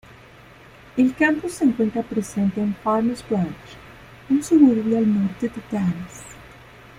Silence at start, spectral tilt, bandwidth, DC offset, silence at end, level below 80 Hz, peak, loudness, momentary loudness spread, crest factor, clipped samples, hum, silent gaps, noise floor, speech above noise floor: 0.95 s; -6.5 dB/octave; 15 kHz; under 0.1%; 0.5 s; -54 dBFS; -4 dBFS; -21 LUFS; 19 LU; 18 dB; under 0.1%; none; none; -46 dBFS; 26 dB